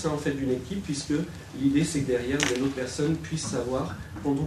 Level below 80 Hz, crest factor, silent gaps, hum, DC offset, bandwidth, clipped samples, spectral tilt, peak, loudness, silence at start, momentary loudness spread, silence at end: -48 dBFS; 24 dB; none; none; under 0.1%; 13.5 kHz; under 0.1%; -5 dB/octave; -4 dBFS; -28 LUFS; 0 s; 7 LU; 0 s